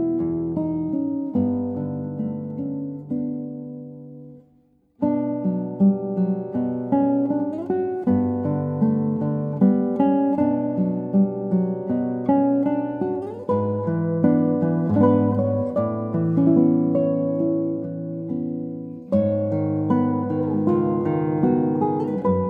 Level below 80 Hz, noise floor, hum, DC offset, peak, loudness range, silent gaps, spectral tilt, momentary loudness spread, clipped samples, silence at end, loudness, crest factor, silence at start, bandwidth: -60 dBFS; -59 dBFS; none; under 0.1%; -4 dBFS; 7 LU; none; -12.5 dB/octave; 9 LU; under 0.1%; 0 s; -22 LUFS; 16 dB; 0 s; 3.5 kHz